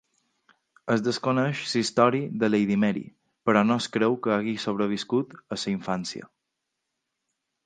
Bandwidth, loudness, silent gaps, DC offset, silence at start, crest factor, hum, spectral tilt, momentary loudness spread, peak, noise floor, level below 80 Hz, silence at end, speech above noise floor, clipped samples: 9.6 kHz; -25 LUFS; none; under 0.1%; 0.85 s; 22 dB; none; -5.5 dB/octave; 11 LU; -4 dBFS; -82 dBFS; -68 dBFS; 1.4 s; 57 dB; under 0.1%